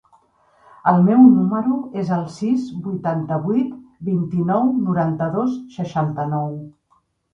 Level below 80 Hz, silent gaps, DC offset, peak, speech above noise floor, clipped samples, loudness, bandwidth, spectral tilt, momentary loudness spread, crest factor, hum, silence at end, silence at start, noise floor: -58 dBFS; none; under 0.1%; 0 dBFS; 45 dB; under 0.1%; -19 LUFS; 7 kHz; -9.5 dB/octave; 14 LU; 18 dB; none; 0.65 s; 0.85 s; -63 dBFS